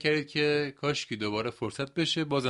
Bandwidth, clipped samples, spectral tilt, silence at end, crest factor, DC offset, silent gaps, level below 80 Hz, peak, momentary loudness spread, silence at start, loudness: 11.5 kHz; under 0.1%; -4.5 dB/octave; 0 s; 18 dB; under 0.1%; none; -64 dBFS; -12 dBFS; 6 LU; 0 s; -30 LUFS